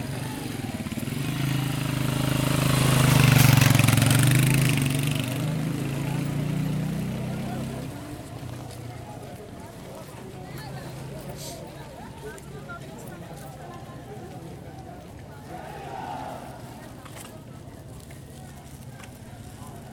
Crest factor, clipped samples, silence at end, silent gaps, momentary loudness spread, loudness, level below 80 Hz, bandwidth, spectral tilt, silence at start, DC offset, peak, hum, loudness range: 24 dB; under 0.1%; 0 s; none; 23 LU; -24 LUFS; -46 dBFS; 19 kHz; -5 dB/octave; 0 s; under 0.1%; -2 dBFS; none; 20 LU